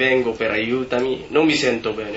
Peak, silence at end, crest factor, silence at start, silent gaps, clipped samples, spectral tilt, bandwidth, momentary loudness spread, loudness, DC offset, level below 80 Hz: -4 dBFS; 0 s; 16 dB; 0 s; none; under 0.1%; -4.5 dB/octave; 8 kHz; 5 LU; -20 LUFS; under 0.1%; -50 dBFS